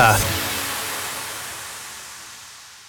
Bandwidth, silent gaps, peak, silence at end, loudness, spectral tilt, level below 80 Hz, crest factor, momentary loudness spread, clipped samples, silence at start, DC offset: over 20 kHz; none; -2 dBFS; 0 s; -24 LUFS; -2.5 dB/octave; -44 dBFS; 22 dB; 17 LU; under 0.1%; 0 s; under 0.1%